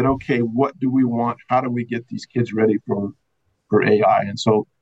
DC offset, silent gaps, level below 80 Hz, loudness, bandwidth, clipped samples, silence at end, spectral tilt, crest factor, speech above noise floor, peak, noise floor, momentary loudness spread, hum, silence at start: under 0.1%; none; -52 dBFS; -20 LUFS; 8.2 kHz; under 0.1%; 0.2 s; -7 dB/octave; 14 dB; 50 dB; -6 dBFS; -69 dBFS; 9 LU; none; 0 s